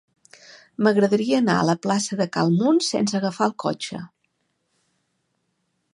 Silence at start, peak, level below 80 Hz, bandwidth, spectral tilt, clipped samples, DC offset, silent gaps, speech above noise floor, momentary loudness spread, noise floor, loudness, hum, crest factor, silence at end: 0.8 s; -6 dBFS; -68 dBFS; 11.5 kHz; -5 dB/octave; under 0.1%; under 0.1%; none; 52 dB; 10 LU; -73 dBFS; -21 LUFS; none; 18 dB; 1.85 s